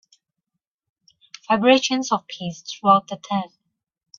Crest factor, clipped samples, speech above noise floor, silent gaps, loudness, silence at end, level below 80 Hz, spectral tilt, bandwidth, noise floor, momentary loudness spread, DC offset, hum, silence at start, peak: 22 dB; under 0.1%; 61 dB; none; -20 LUFS; 0.75 s; -68 dBFS; -4 dB/octave; 7.4 kHz; -82 dBFS; 15 LU; under 0.1%; none; 1.5 s; -2 dBFS